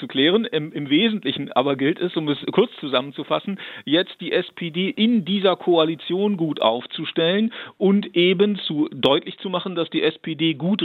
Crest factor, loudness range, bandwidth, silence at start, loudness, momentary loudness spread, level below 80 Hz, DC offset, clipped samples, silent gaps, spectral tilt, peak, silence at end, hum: 20 dB; 2 LU; 4.5 kHz; 0 s; -21 LUFS; 7 LU; -70 dBFS; under 0.1%; under 0.1%; none; -8 dB/octave; -2 dBFS; 0 s; none